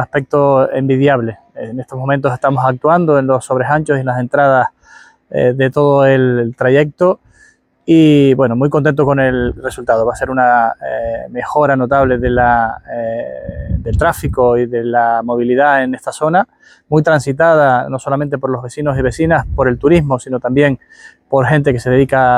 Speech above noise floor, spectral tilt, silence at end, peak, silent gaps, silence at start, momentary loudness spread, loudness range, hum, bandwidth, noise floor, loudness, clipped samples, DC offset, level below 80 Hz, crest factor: 37 dB; -7.5 dB/octave; 0 s; 0 dBFS; none; 0 s; 10 LU; 3 LU; none; 15.5 kHz; -50 dBFS; -13 LUFS; under 0.1%; under 0.1%; -34 dBFS; 12 dB